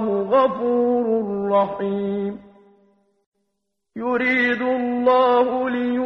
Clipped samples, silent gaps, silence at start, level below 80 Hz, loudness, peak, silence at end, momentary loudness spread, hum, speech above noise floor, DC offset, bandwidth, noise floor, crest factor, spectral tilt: under 0.1%; 3.26-3.32 s; 0 s; -62 dBFS; -20 LUFS; -6 dBFS; 0 s; 9 LU; none; 58 dB; under 0.1%; 6 kHz; -77 dBFS; 14 dB; -8 dB/octave